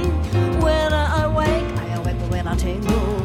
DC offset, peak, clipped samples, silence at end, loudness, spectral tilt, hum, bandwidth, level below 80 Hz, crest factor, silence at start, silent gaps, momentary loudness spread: under 0.1%; -6 dBFS; under 0.1%; 0 s; -21 LUFS; -6.5 dB/octave; none; 15.5 kHz; -24 dBFS; 12 dB; 0 s; none; 6 LU